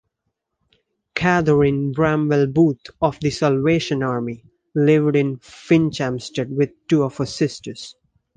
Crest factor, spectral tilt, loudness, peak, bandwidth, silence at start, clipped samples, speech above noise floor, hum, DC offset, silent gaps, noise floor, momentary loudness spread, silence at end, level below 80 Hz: 18 dB; -7 dB/octave; -19 LUFS; -2 dBFS; 9.6 kHz; 1.15 s; under 0.1%; 58 dB; none; under 0.1%; none; -77 dBFS; 14 LU; 0.45 s; -50 dBFS